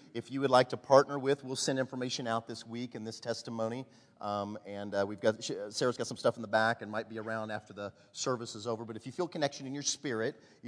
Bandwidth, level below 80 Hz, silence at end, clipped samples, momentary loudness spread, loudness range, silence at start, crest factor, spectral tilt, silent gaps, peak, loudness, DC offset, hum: 11 kHz; -82 dBFS; 0 s; under 0.1%; 14 LU; 6 LU; 0 s; 26 dB; -4 dB/octave; none; -8 dBFS; -34 LUFS; under 0.1%; none